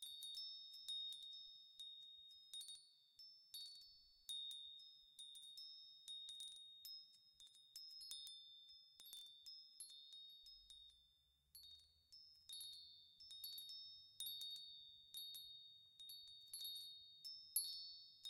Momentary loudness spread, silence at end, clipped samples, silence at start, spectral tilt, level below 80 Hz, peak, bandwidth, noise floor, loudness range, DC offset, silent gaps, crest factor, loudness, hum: 13 LU; 0 s; under 0.1%; 0 s; 3 dB/octave; under -90 dBFS; -28 dBFS; 16 kHz; -80 dBFS; 7 LU; under 0.1%; none; 28 dB; -54 LUFS; none